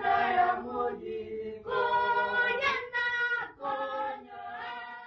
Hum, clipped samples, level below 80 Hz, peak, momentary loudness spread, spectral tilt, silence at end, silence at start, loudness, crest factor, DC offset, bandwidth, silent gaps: none; under 0.1%; -64 dBFS; -16 dBFS; 13 LU; -4 dB/octave; 0 s; 0 s; -30 LUFS; 16 dB; under 0.1%; 7 kHz; none